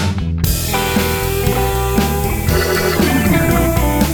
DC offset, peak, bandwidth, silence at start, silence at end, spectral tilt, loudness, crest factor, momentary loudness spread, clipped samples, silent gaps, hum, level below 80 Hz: under 0.1%; -2 dBFS; over 20 kHz; 0 s; 0 s; -5 dB/octave; -15 LUFS; 14 dB; 4 LU; under 0.1%; none; none; -22 dBFS